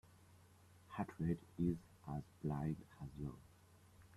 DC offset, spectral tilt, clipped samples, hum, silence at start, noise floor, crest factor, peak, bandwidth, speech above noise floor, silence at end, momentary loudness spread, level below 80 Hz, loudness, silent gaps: under 0.1%; -9 dB/octave; under 0.1%; none; 0.1 s; -67 dBFS; 20 dB; -26 dBFS; 13 kHz; 23 dB; 0 s; 12 LU; -64 dBFS; -45 LUFS; none